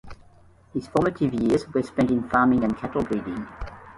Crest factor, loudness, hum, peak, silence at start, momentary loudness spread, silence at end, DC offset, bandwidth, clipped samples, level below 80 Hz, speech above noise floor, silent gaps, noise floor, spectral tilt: 18 dB; -24 LUFS; none; -8 dBFS; 0.05 s; 13 LU; 0.05 s; under 0.1%; 11.5 kHz; under 0.1%; -46 dBFS; 30 dB; none; -53 dBFS; -7.5 dB/octave